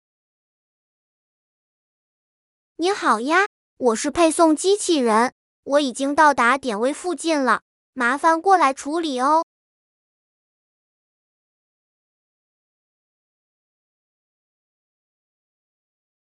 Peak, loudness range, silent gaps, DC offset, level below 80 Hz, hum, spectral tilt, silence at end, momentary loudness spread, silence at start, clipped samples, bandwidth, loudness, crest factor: -4 dBFS; 8 LU; 3.46-3.77 s, 5.32-5.63 s, 7.62-7.93 s; under 0.1%; -64 dBFS; none; -2.5 dB/octave; 6.8 s; 8 LU; 2.8 s; under 0.1%; 11.5 kHz; -19 LUFS; 20 dB